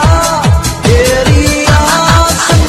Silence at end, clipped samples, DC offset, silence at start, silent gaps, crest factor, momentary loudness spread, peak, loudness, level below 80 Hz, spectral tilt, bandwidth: 0 s; 1%; under 0.1%; 0 s; none; 8 dB; 3 LU; 0 dBFS; -8 LUFS; -16 dBFS; -4.5 dB/octave; 14 kHz